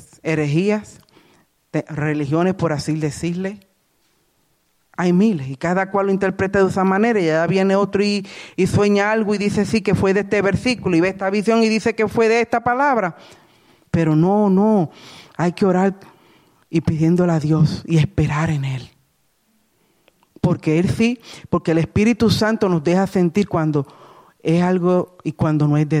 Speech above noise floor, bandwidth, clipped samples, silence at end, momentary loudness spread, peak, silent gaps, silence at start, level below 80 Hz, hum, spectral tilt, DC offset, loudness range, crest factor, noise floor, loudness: 46 dB; 13.5 kHz; under 0.1%; 0 s; 8 LU; -6 dBFS; none; 0.25 s; -48 dBFS; none; -7 dB/octave; under 0.1%; 5 LU; 14 dB; -64 dBFS; -18 LUFS